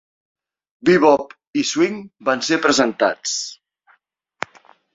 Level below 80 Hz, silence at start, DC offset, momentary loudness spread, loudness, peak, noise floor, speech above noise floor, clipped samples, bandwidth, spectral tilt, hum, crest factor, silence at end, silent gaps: -62 dBFS; 0.85 s; under 0.1%; 18 LU; -18 LUFS; -2 dBFS; -63 dBFS; 45 dB; under 0.1%; 8 kHz; -3.5 dB/octave; none; 18 dB; 1.4 s; 1.47-1.53 s